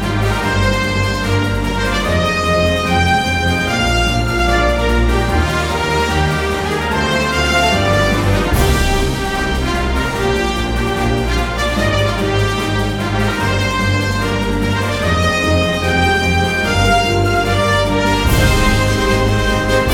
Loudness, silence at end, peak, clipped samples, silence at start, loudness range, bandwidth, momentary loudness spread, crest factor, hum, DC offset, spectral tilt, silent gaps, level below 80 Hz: -15 LUFS; 0 s; 0 dBFS; under 0.1%; 0 s; 3 LU; 18 kHz; 4 LU; 14 dB; none; under 0.1%; -5 dB/octave; none; -22 dBFS